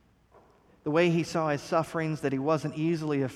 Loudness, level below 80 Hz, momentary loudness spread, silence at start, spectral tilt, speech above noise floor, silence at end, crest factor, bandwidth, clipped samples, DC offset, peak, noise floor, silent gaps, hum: -28 LUFS; -64 dBFS; 5 LU; 0.85 s; -6.5 dB/octave; 32 dB; 0 s; 16 dB; 13.5 kHz; under 0.1%; under 0.1%; -12 dBFS; -60 dBFS; none; none